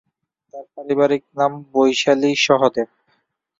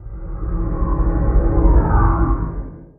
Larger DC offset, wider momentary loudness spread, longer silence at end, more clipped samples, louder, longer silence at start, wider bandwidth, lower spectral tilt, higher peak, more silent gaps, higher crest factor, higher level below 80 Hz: neither; first, 17 LU vs 13 LU; first, 0.75 s vs 0.15 s; neither; about the same, -18 LUFS vs -19 LUFS; first, 0.55 s vs 0 s; first, 7.8 kHz vs 2.3 kHz; second, -4 dB/octave vs -12.5 dB/octave; about the same, -2 dBFS vs -2 dBFS; neither; about the same, 18 dB vs 14 dB; second, -64 dBFS vs -18 dBFS